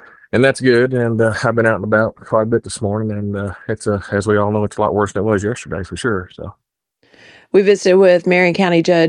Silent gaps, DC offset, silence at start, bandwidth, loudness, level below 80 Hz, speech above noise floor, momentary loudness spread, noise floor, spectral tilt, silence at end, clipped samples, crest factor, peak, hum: none; under 0.1%; 0.35 s; 11 kHz; -16 LUFS; -48 dBFS; 46 dB; 11 LU; -61 dBFS; -6 dB/octave; 0 s; under 0.1%; 14 dB; 0 dBFS; none